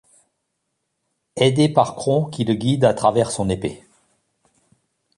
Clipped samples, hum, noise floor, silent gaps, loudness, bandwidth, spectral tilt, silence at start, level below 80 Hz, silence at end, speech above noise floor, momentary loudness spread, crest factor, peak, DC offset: under 0.1%; none; -75 dBFS; none; -19 LUFS; 11.5 kHz; -6 dB/octave; 1.35 s; -50 dBFS; 1.4 s; 57 dB; 8 LU; 20 dB; -2 dBFS; under 0.1%